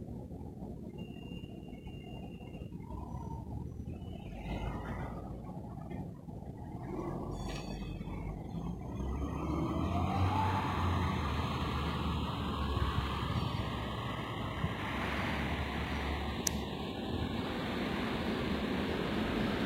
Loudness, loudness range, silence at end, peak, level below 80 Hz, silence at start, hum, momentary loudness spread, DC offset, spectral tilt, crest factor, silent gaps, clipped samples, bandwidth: -38 LUFS; 10 LU; 0 s; -10 dBFS; -44 dBFS; 0 s; none; 12 LU; under 0.1%; -5.5 dB/octave; 26 dB; none; under 0.1%; 16 kHz